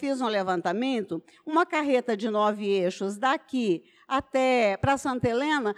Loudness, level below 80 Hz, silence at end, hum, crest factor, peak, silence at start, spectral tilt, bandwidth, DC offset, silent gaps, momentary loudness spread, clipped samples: -26 LUFS; -58 dBFS; 0.05 s; none; 14 dB; -12 dBFS; 0 s; -5.5 dB/octave; 12.5 kHz; under 0.1%; none; 6 LU; under 0.1%